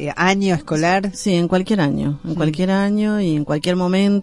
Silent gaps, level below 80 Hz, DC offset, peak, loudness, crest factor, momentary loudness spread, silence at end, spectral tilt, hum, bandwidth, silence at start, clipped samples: none; -46 dBFS; under 0.1%; -4 dBFS; -18 LUFS; 14 dB; 3 LU; 0 s; -6 dB/octave; none; 11.5 kHz; 0 s; under 0.1%